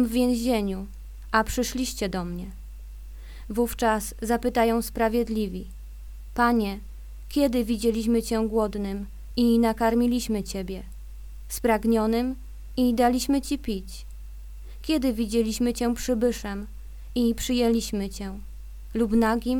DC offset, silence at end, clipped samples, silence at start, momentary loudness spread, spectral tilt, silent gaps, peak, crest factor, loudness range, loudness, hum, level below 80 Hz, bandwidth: under 0.1%; 0 s; under 0.1%; 0 s; 21 LU; -5 dB/octave; none; -6 dBFS; 20 dB; 3 LU; -25 LUFS; none; -38 dBFS; 19 kHz